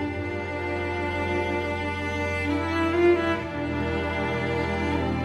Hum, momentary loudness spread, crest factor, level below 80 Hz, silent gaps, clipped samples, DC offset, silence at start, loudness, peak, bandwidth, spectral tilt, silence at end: none; 8 LU; 16 dB; -42 dBFS; none; under 0.1%; under 0.1%; 0 s; -26 LUFS; -10 dBFS; 12 kHz; -7 dB/octave; 0 s